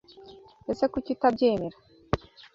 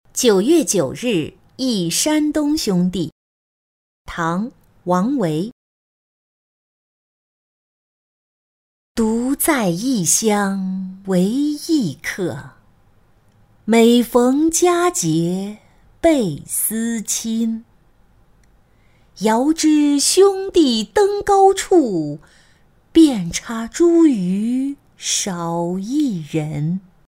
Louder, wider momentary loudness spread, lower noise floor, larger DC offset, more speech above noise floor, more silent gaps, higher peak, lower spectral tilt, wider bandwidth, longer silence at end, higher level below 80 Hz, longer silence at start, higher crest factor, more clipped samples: second, -28 LUFS vs -17 LUFS; about the same, 13 LU vs 13 LU; second, -50 dBFS vs -54 dBFS; neither; second, 24 dB vs 37 dB; second, none vs 3.12-4.05 s, 5.52-8.95 s; second, -6 dBFS vs -2 dBFS; first, -7.5 dB/octave vs -4.5 dB/octave; second, 7.6 kHz vs 16 kHz; about the same, 0.35 s vs 0.3 s; about the same, -50 dBFS vs -50 dBFS; about the same, 0.2 s vs 0.15 s; first, 22 dB vs 16 dB; neither